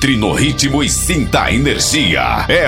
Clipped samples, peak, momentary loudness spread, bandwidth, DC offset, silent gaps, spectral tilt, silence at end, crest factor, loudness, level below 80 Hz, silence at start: under 0.1%; 0 dBFS; 2 LU; 16.5 kHz; under 0.1%; none; -3.5 dB/octave; 0 s; 12 dB; -13 LUFS; -26 dBFS; 0 s